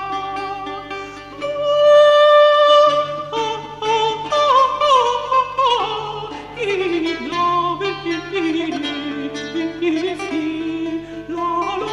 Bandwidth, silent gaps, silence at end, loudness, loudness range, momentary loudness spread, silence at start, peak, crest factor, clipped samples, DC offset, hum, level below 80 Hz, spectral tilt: 10 kHz; none; 0 s; -17 LUFS; 9 LU; 16 LU; 0 s; -2 dBFS; 14 dB; under 0.1%; under 0.1%; 50 Hz at -50 dBFS; -52 dBFS; -4 dB/octave